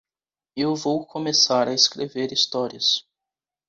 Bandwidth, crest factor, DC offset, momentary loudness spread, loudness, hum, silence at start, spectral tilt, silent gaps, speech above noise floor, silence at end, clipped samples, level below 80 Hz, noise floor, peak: 8 kHz; 20 dB; under 0.1%; 9 LU; -21 LUFS; none; 0.55 s; -2.5 dB/octave; none; over 67 dB; 0.7 s; under 0.1%; -68 dBFS; under -90 dBFS; -4 dBFS